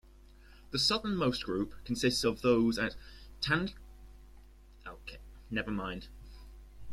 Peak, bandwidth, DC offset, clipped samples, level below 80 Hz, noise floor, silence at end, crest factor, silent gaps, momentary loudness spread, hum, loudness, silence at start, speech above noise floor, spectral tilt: -14 dBFS; 14 kHz; under 0.1%; under 0.1%; -52 dBFS; -56 dBFS; 0 s; 20 dB; none; 23 LU; none; -32 LUFS; 0.5 s; 24 dB; -4.5 dB/octave